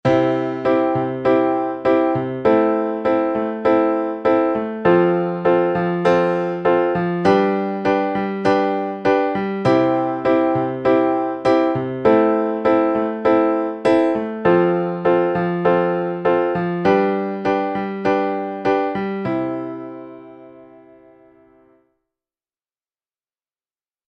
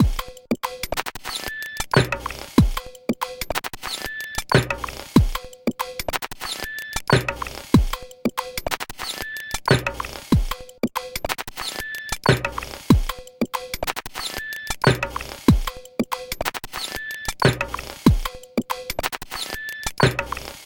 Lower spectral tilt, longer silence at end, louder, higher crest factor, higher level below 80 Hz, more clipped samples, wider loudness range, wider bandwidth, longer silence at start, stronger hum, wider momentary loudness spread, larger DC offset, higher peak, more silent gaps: first, -8 dB/octave vs -5 dB/octave; first, 3.45 s vs 0 s; first, -18 LUFS vs -24 LUFS; second, 16 dB vs 22 dB; second, -54 dBFS vs -32 dBFS; neither; first, 6 LU vs 1 LU; second, 8 kHz vs 17 kHz; about the same, 0.05 s vs 0 s; neither; second, 5 LU vs 9 LU; neither; about the same, -2 dBFS vs 0 dBFS; neither